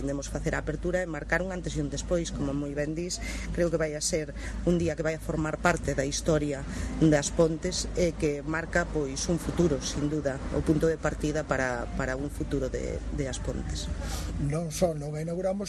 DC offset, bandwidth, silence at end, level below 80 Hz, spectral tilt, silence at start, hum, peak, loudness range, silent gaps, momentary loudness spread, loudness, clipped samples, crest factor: under 0.1%; 13 kHz; 0 s; -38 dBFS; -5 dB/octave; 0 s; none; -8 dBFS; 4 LU; none; 7 LU; -29 LUFS; under 0.1%; 22 dB